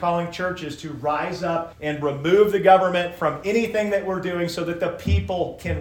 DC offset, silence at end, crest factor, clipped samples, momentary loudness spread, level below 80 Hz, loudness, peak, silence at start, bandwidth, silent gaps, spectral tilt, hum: under 0.1%; 0 s; 20 dB; under 0.1%; 11 LU; -40 dBFS; -22 LUFS; -2 dBFS; 0 s; 17.5 kHz; none; -6 dB/octave; none